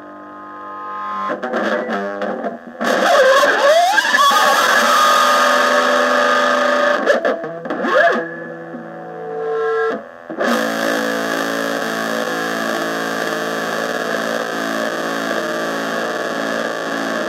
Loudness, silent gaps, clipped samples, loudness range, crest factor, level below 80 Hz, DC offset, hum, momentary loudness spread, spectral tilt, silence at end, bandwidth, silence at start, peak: -16 LUFS; none; under 0.1%; 8 LU; 16 dB; -72 dBFS; under 0.1%; none; 16 LU; -2.5 dB/octave; 0 s; 16 kHz; 0 s; 0 dBFS